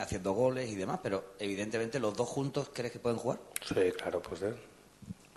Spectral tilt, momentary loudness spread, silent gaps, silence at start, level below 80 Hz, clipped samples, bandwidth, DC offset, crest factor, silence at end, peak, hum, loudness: -5 dB/octave; 8 LU; none; 0 s; -62 dBFS; under 0.1%; 12.5 kHz; under 0.1%; 24 dB; 0.15 s; -12 dBFS; none; -35 LUFS